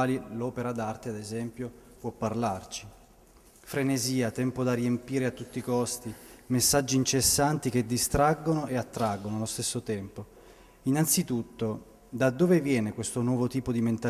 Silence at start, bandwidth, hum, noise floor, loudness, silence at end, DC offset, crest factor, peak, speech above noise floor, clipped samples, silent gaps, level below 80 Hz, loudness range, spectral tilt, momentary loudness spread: 0 s; 16 kHz; none; -57 dBFS; -28 LUFS; 0 s; under 0.1%; 18 dB; -10 dBFS; 28 dB; under 0.1%; none; -52 dBFS; 7 LU; -4.5 dB/octave; 14 LU